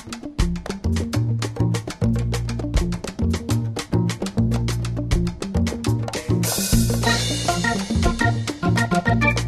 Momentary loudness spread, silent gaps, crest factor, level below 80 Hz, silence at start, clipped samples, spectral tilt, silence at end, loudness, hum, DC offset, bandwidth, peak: 6 LU; none; 18 dB; -30 dBFS; 0 s; under 0.1%; -5 dB/octave; 0 s; -22 LUFS; none; under 0.1%; 13.5 kHz; -4 dBFS